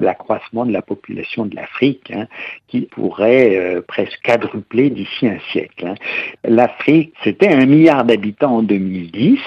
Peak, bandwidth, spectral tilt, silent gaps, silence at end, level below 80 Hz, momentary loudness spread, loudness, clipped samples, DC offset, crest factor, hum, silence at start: 0 dBFS; 7.4 kHz; -8 dB/octave; none; 0 s; -62 dBFS; 13 LU; -16 LUFS; under 0.1%; under 0.1%; 16 dB; none; 0 s